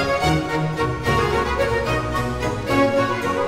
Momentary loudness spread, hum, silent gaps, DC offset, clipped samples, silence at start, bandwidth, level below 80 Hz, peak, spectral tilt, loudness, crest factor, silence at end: 4 LU; none; none; 0.4%; under 0.1%; 0 s; 16 kHz; -34 dBFS; -6 dBFS; -5.5 dB/octave; -21 LUFS; 14 dB; 0 s